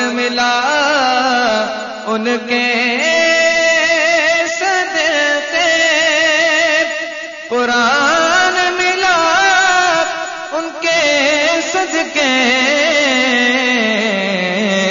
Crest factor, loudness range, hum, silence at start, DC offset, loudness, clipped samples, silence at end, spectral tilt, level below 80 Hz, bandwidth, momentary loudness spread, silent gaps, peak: 12 dB; 1 LU; none; 0 s; under 0.1%; -12 LUFS; under 0.1%; 0 s; -2 dB/octave; -54 dBFS; 7.6 kHz; 7 LU; none; -2 dBFS